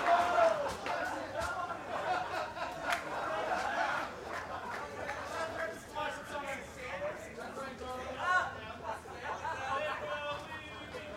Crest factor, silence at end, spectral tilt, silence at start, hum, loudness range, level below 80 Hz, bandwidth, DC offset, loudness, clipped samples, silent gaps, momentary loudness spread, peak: 20 dB; 0 s; -3.5 dB/octave; 0 s; none; 5 LU; -62 dBFS; 16.5 kHz; under 0.1%; -37 LUFS; under 0.1%; none; 11 LU; -16 dBFS